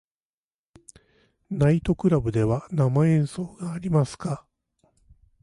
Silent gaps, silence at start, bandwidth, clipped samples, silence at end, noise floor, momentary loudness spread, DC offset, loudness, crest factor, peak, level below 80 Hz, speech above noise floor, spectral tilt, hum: none; 1.5 s; 11.5 kHz; under 0.1%; 1.05 s; under -90 dBFS; 12 LU; under 0.1%; -24 LUFS; 16 dB; -10 dBFS; -48 dBFS; over 67 dB; -8.5 dB/octave; none